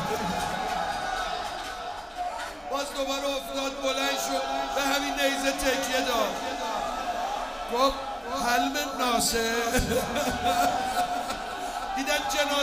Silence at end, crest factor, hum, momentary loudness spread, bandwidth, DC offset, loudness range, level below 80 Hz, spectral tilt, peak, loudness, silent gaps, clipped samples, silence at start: 0 s; 20 dB; none; 8 LU; 15.5 kHz; under 0.1%; 5 LU; -46 dBFS; -2.5 dB/octave; -8 dBFS; -28 LUFS; none; under 0.1%; 0 s